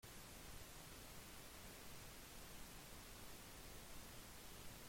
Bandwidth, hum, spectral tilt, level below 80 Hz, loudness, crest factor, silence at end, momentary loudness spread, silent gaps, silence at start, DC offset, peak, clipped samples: 16.5 kHz; none; -3 dB/octave; -64 dBFS; -57 LUFS; 14 dB; 0 s; 0 LU; none; 0.05 s; under 0.1%; -42 dBFS; under 0.1%